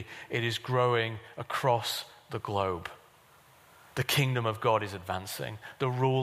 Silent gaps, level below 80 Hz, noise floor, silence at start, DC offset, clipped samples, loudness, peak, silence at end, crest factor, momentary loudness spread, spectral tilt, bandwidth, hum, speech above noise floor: none; -66 dBFS; -59 dBFS; 0 s; under 0.1%; under 0.1%; -31 LUFS; -12 dBFS; 0 s; 18 dB; 12 LU; -5 dB/octave; 15.5 kHz; none; 29 dB